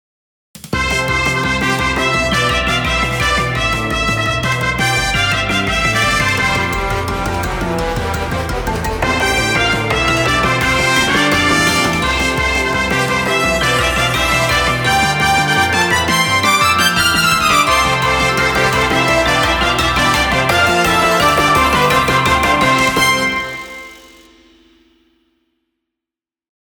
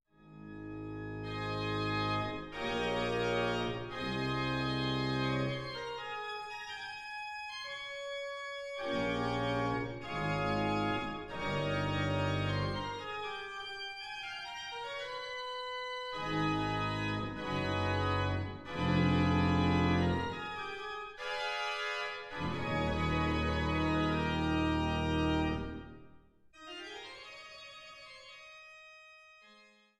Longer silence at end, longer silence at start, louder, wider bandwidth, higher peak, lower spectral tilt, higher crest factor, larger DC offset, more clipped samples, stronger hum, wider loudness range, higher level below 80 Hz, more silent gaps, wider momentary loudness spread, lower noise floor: first, 2.75 s vs 0.4 s; first, 0.55 s vs 0.2 s; first, -13 LUFS vs -35 LUFS; first, over 20 kHz vs 12 kHz; first, 0 dBFS vs -18 dBFS; second, -3.5 dB/octave vs -6 dB/octave; about the same, 14 dB vs 18 dB; neither; neither; neither; second, 5 LU vs 8 LU; first, -30 dBFS vs -50 dBFS; neither; second, 7 LU vs 14 LU; first, -88 dBFS vs -62 dBFS